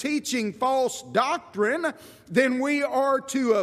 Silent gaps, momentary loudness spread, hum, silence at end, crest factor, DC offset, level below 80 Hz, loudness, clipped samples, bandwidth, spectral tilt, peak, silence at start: none; 4 LU; none; 0 s; 18 dB; under 0.1%; -72 dBFS; -25 LUFS; under 0.1%; 15.5 kHz; -4 dB/octave; -8 dBFS; 0 s